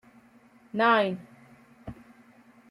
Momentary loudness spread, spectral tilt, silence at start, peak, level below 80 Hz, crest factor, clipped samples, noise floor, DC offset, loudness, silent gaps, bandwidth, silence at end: 24 LU; -6.5 dB/octave; 0.75 s; -10 dBFS; -64 dBFS; 20 dB; under 0.1%; -58 dBFS; under 0.1%; -25 LUFS; none; 12 kHz; 0.75 s